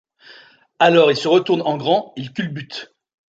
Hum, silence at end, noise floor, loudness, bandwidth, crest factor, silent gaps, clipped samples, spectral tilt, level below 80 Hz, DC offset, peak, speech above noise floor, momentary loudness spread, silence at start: none; 0.55 s; -47 dBFS; -17 LUFS; 8 kHz; 18 dB; none; under 0.1%; -5.5 dB/octave; -66 dBFS; under 0.1%; -2 dBFS; 30 dB; 17 LU; 0.3 s